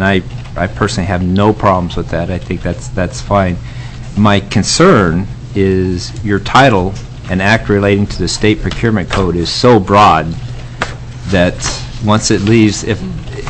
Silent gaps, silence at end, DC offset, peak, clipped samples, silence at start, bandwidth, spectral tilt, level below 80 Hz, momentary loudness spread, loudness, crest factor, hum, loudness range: none; 0 s; under 0.1%; 0 dBFS; under 0.1%; 0 s; 8.6 kHz; -5.5 dB/octave; -28 dBFS; 13 LU; -12 LUFS; 12 dB; none; 3 LU